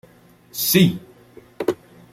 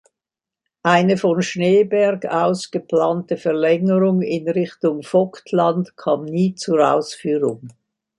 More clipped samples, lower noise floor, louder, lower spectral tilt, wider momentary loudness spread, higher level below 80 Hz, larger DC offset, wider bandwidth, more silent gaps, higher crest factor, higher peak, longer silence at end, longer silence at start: neither; second, -51 dBFS vs -88 dBFS; about the same, -19 LUFS vs -19 LUFS; second, -4.5 dB/octave vs -6.5 dB/octave; first, 18 LU vs 6 LU; first, -56 dBFS vs -66 dBFS; neither; first, 16.5 kHz vs 11.5 kHz; neither; about the same, 20 dB vs 18 dB; about the same, -2 dBFS vs -2 dBFS; about the same, 0.4 s vs 0.5 s; second, 0.55 s vs 0.85 s